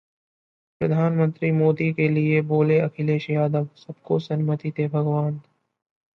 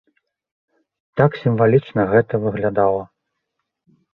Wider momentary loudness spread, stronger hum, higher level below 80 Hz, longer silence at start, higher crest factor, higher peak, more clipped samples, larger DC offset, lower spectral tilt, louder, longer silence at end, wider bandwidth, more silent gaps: about the same, 8 LU vs 6 LU; neither; second, -64 dBFS vs -52 dBFS; second, 0.8 s vs 1.15 s; about the same, 16 dB vs 18 dB; second, -8 dBFS vs -2 dBFS; neither; neither; about the same, -10 dB/octave vs -10.5 dB/octave; second, -22 LUFS vs -18 LUFS; second, 0.75 s vs 1.1 s; first, 5.8 kHz vs 5 kHz; neither